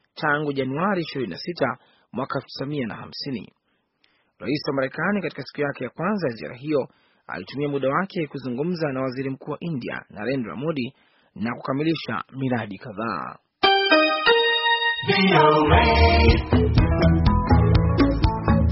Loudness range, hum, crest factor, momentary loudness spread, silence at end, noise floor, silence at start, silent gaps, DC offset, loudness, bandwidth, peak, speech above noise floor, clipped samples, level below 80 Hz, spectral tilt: 11 LU; none; 18 dB; 15 LU; 0 s; -67 dBFS; 0.15 s; none; under 0.1%; -22 LUFS; 6 kHz; -4 dBFS; 44 dB; under 0.1%; -30 dBFS; -4.5 dB/octave